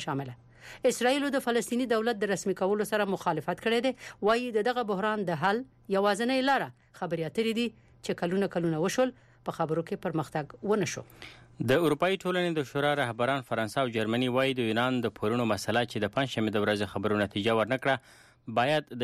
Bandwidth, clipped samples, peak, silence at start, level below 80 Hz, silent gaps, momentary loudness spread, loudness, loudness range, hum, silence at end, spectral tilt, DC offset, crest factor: 15 kHz; under 0.1%; -14 dBFS; 0 s; -64 dBFS; none; 8 LU; -29 LUFS; 3 LU; none; 0 s; -5 dB/octave; under 0.1%; 14 dB